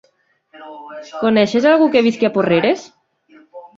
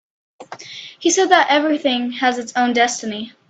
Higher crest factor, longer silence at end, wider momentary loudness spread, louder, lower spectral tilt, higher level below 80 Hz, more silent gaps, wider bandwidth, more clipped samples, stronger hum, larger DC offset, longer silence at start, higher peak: about the same, 16 dB vs 18 dB; about the same, 0.1 s vs 0.2 s; about the same, 21 LU vs 19 LU; about the same, -15 LUFS vs -17 LUFS; first, -6 dB/octave vs -1.5 dB/octave; first, -60 dBFS vs -66 dBFS; neither; second, 7.6 kHz vs 9.2 kHz; neither; neither; neither; first, 0.6 s vs 0.4 s; about the same, -2 dBFS vs 0 dBFS